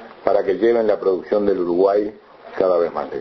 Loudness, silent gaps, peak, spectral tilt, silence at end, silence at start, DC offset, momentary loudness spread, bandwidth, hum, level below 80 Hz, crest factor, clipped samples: -19 LUFS; none; 0 dBFS; -8.5 dB/octave; 0 s; 0 s; under 0.1%; 5 LU; 6 kHz; none; -56 dBFS; 18 dB; under 0.1%